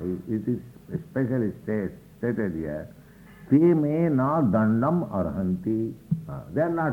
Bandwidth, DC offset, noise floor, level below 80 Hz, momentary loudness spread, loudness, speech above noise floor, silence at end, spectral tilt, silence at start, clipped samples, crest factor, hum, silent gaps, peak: 16 kHz; under 0.1%; -48 dBFS; -54 dBFS; 12 LU; -26 LUFS; 23 dB; 0 s; -10.5 dB/octave; 0 s; under 0.1%; 16 dB; none; none; -8 dBFS